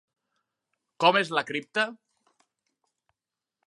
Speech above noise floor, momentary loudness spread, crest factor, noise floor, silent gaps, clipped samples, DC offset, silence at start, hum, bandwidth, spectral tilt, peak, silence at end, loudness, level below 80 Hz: 64 dB; 8 LU; 26 dB; -89 dBFS; none; under 0.1%; under 0.1%; 1 s; none; 11.5 kHz; -4 dB/octave; -6 dBFS; 1.7 s; -25 LUFS; -86 dBFS